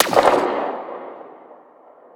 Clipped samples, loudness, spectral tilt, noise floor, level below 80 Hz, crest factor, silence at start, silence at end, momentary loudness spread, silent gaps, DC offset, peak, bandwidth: under 0.1%; -19 LUFS; -3.5 dB/octave; -48 dBFS; -58 dBFS; 20 dB; 0 s; 0.6 s; 24 LU; none; under 0.1%; 0 dBFS; 19.5 kHz